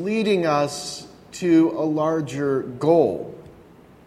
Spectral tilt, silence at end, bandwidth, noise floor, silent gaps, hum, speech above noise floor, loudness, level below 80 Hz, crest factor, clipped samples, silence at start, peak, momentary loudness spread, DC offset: -6 dB/octave; 0.55 s; 13 kHz; -48 dBFS; none; none; 28 dB; -21 LUFS; -60 dBFS; 18 dB; under 0.1%; 0 s; -4 dBFS; 15 LU; under 0.1%